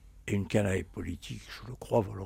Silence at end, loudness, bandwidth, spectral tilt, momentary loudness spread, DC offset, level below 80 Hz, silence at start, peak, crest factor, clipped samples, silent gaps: 0 s; -33 LUFS; 16 kHz; -6.5 dB/octave; 14 LU; under 0.1%; -52 dBFS; 0 s; -12 dBFS; 20 dB; under 0.1%; none